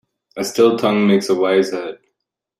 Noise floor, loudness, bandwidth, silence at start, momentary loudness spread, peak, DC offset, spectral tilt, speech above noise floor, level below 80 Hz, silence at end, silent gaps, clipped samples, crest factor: -78 dBFS; -16 LUFS; 14 kHz; 0.35 s; 13 LU; -2 dBFS; under 0.1%; -5.5 dB/octave; 62 dB; -64 dBFS; 0.65 s; none; under 0.1%; 16 dB